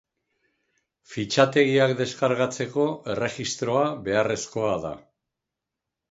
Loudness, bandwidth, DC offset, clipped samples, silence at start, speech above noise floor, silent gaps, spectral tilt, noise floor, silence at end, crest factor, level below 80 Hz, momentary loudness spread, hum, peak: -24 LUFS; 8 kHz; under 0.1%; under 0.1%; 1.1 s; 62 dB; none; -4.5 dB/octave; -86 dBFS; 1.1 s; 22 dB; -60 dBFS; 11 LU; none; -4 dBFS